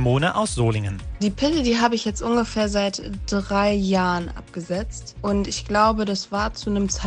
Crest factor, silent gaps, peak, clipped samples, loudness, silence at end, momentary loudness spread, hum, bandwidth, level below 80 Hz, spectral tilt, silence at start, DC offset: 18 dB; none; -4 dBFS; under 0.1%; -22 LUFS; 0 s; 9 LU; none; 10 kHz; -36 dBFS; -5 dB/octave; 0 s; under 0.1%